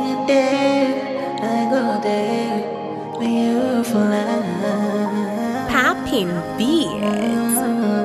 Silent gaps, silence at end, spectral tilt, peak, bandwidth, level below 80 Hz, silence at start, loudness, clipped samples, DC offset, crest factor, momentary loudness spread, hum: none; 0 s; -5 dB/octave; -4 dBFS; 14 kHz; -52 dBFS; 0 s; -19 LUFS; under 0.1%; under 0.1%; 14 dB; 6 LU; none